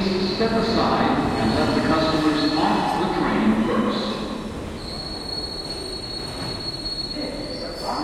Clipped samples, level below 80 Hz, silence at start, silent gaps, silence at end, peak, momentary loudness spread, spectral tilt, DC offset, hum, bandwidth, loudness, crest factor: under 0.1%; -40 dBFS; 0 s; none; 0 s; -6 dBFS; 10 LU; -5.5 dB/octave; under 0.1%; none; 14 kHz; -23 LUFS; 16 dB